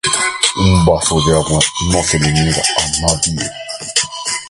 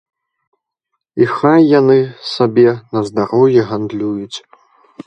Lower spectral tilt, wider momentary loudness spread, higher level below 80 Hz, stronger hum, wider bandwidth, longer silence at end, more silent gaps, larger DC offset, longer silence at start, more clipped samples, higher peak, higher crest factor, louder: second, -3.5 dB/octave vs -7.5 dB/octave; second, 5 LU vs 13 LU; first, -28 dBFS vs -58 dBFS; neither; first, 11.5 kHz vs 8.8 kHz; second, 0 s vs 0.65 s; neither; neither; second, 0.05 s vs 1.15 s; neither; about the same, 0 dBFS vs 0 dBFS; about the same, 14 dB vs 14 dB; about the same, -13 LUFS vs -13 LUFS